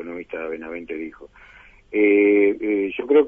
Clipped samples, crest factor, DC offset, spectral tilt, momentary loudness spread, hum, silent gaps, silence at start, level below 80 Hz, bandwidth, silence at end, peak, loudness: under 0.1%; 16 dB; under 0.1%; -8 dB/octave; 17 LU; 50 Hz at -60 dBFS; none; 0 s; -56 dBFS; 3.6 kHz; 0 s; -6 dBFS; -20 LUFS